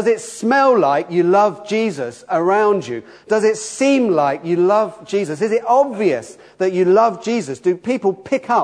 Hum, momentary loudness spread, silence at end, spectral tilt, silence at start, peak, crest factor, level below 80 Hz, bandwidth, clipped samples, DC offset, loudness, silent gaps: none; 8 LU; 0 s; -5.5 dB/octave; 0 s; -2 dBFS; 14 dB; -68 dBFS; 11 kHz; under 0.1%; under 0.1%; -17 LUFS; none